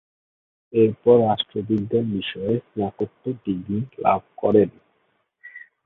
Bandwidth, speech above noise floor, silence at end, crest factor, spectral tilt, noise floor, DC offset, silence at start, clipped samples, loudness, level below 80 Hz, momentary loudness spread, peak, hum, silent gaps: 4 kHz; 47 dB; 0.2 s; 18 dB; -10 dB/octave; -68 dBFS; under 0.1%; 0.75 s; under 0.1%; -22 LUFS; -56 dBFS; 12 LU; -4 dBFS; none; none